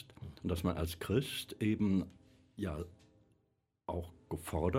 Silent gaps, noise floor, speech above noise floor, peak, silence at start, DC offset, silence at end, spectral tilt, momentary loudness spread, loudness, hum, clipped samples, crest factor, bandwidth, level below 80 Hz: none; -79 dBFS; 43 dB; -18 dBFS; 0 s; under 0.1%; 0 s; -6.5 dB/octave; 15 LU; -38 LUFS; none; under 0.1%; 20 dB; 16 kHz; -52 dBFS